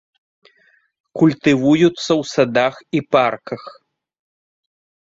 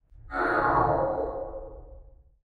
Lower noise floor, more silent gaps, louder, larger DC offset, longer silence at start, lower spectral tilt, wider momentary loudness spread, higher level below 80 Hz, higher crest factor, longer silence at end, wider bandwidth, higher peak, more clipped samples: first, -58 dBFS vs -51 dBFS; neither; first, -16 LUFS vs -27 LUFS; neither; first, 1.15 s vs 0.15 s; second, -6 dB/octave vs -8.5 dB/octave; about the same, 15 LU vs 17 LU; second, -58 dBFS vs -44 dBFS; about the same, 18 dB vs 18 dB; first, 1.35 s vs 0.45 s; second, 7.8 kHz vs 11 kHz; first, -2 dBFS vs -12 dBFS; neither